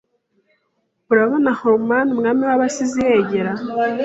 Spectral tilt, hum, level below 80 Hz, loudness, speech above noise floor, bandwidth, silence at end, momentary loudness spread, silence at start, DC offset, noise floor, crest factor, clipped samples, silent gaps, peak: -5.5 dB/octave; none; -56 dBFS; -17 LUFS; 52 dB; 8.2 kHz; 0 s; 5 LU; 1.1 s; under 0.1%; -69 dBFS; 16 dB; under 0.1%; none; -2 dBFS